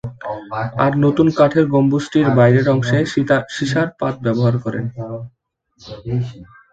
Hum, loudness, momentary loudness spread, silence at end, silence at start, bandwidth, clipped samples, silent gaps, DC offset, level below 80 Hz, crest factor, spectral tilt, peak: none; -17 LUFS; 16 LU; 0.3 s; 0.05 s; 8 kHz; under 0.1%; none; under 0.1%; -48 dBFS; 16 dB; -7.5 dB/octave; 0 dBFS